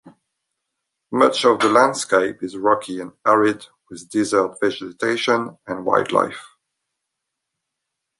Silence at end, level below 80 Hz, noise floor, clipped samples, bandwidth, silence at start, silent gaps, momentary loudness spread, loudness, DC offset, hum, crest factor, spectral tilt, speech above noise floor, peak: 1.75 s; -66 dBFS; -80 dBFS; under 0.1%; 11.5 kHz; 0.05 s; none; 13 LU; -19 LUFS; under 0.1%; none; 20 dB; -4 dB/octave; 61 dB; -2 dBFS